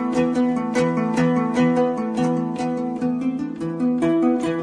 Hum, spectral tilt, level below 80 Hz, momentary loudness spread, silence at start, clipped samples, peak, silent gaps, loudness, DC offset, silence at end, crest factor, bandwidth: none; -7 dB/octave; -56 dBFS; 6 LU; 0 s; under 0.1%; -8 dBFS; none; -21 LUFS; under 0.1%; 0 s; 14 dB; 10.5 kHz